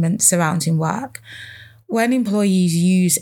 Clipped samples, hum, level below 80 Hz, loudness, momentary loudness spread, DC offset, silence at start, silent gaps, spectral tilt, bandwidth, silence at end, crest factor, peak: under 0.1%; none; -66 dBFS; -17 LUFS; 20 LU; under 0.1%; 0 s; none; -5 dB/octave; 18.5 kHz; 0 s; 18 dB; 0 dBFS